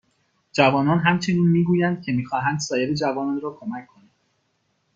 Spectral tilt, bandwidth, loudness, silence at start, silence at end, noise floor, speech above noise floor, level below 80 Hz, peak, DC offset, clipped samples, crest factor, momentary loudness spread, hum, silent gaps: -6 dB/octave; 7.6 kHz; -21 LUFS; 0.55 s; 1.1 s; -70 dBFS; 49 dB; -60 dBFS; -2 dBFS; under 0.1%; under 0.1%; 20 dB; 11 LU; none; none